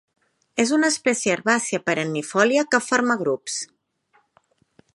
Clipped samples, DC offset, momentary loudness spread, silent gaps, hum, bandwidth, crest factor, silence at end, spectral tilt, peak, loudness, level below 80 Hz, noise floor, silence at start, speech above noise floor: under 0.1%; under 0.1%; 9 LU; none; none; 11.5 kHz; 20 dB; 1.3 s; -3 dB/octave; -4 dBFS; -21 LUFS; -72 dBFS; -64 dBFS; 0.55 s; 43 dB